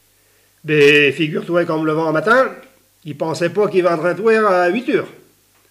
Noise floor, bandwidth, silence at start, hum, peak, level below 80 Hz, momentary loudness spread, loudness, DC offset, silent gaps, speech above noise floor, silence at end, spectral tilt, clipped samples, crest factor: -56 dBFS; 15 kHz; 0.65 s; none; -2 dBFS; -64 dBFS; 12 LU; -15 LUFS; under 0.1%; none; 40 dB; 0.6 s; -5.5 dB/octave; under 0.1%; 14 dB